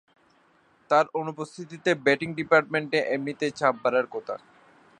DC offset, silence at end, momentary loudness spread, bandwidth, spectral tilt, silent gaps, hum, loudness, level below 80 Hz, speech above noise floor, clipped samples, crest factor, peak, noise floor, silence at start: under 0.1%; 0.65 s; 13 LU; 10 kHz; -5 dB/octave; none; none; -25 LUFS; -72 dBFS; 37 dB; under 0.1%; 22 dB; -4 dBFS; -62 dBFS; 0.9 s